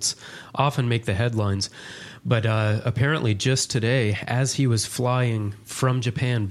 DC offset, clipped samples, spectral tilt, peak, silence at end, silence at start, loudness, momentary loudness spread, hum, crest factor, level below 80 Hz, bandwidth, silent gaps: under 0.1%; under 0.1%; -5 dB/octave; -4 dBFS; 0 s; 0 s; -23 LUFS; 8 LU; none; 18 dB; -54 dBFS; 14 kHz; none